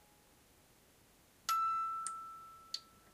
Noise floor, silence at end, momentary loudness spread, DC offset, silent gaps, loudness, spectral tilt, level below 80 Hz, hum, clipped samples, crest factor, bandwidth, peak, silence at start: -67 dBFS; 0.25 s; 15 LU; under 0.1%; none; -39 LUFS; 0.5 dB/octave; -78 dBFS; none; under 0.1%; 20 dB; 15.5 kHz; -22 dBFS; 1.5 s